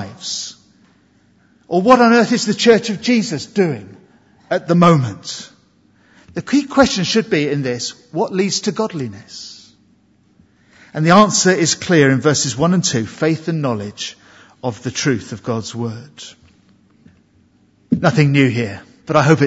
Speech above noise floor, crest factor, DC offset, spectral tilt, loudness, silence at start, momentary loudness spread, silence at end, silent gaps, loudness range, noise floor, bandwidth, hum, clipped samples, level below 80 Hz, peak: 39 dB; 18 dB; under 0.1%; -5 dB/octave; -16 LUFS; 0 s; 17 LU; 0 s; none; 9 LU; -55 dBFS; 8 kHz; none; under 0.1%; -54 dBFS; 0 dBFS